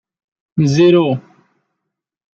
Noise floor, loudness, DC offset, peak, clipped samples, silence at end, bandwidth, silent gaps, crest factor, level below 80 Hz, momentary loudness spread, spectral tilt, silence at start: -78 dBFS; -14 LUFS; under 0.1%; -2 dBFS; under 0.1%; 1.15 s; 7.2 kHz; none; 16 dB; -56 dBFS; 14 LU; -7 dB/octave; 0.55 s